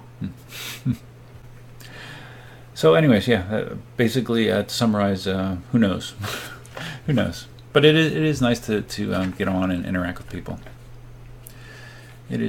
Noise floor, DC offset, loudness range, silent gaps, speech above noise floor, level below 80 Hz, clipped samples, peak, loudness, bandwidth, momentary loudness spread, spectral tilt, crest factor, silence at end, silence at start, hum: -42 dBFS; under 0.1%; 6 LU; none; 22 dB; -48 dBFS; under 0.1%; -2 dBFS; -22 LUFS; 17.5 kHz; 24 LU; -6 dB/octave; 22 dB; 0 s; 0 s; none